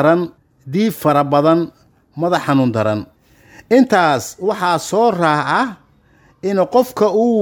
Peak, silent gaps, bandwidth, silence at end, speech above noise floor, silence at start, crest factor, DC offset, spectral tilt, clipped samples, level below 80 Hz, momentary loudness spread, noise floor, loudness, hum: 0 dBFS; none; over 20 kHz; 0 s; 37 dB; 0 s; 16 dB; under 0.1%; -6 dB/octave; under 0.1%; -58 dBFS; 10 LU; -52 dBFS; -16 LUFS; none